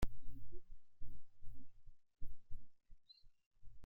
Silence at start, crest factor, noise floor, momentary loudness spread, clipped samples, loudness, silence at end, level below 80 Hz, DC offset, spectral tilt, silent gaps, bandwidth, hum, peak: 0 s; 16 dB; -64 dBFS; 6 LU; under 0.1%; -62 LUFS; 0 s; -52 dBFS; under 0.1%; -6 dB/octave; 3.46-3.51 s; 5.8 kHz; none; -24 dBFS